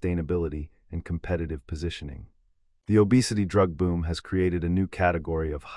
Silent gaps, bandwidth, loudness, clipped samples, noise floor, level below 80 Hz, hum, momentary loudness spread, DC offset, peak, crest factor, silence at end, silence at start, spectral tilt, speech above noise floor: none; 12 kHz; -26 LUFS; under 0.1%; -65 dBFS; -44 dBFS; none; 16 LU; under 0.1%; -8 dBFS; 18 dB; 0 s; 0 s; -6.5 dB/octave; 40 dB